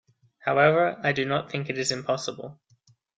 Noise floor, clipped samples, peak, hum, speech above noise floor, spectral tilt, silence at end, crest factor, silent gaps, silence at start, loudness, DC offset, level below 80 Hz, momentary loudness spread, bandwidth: -63 dBFS; under 0.1%; -8 dBFS; none; 38 dB; -4.5 dB/octave; 0.65 s; 20 dB; none; 0.45 s; -25 LUFS; under 0.1%; -66 dBFS; 14 LU; 9.6 kHz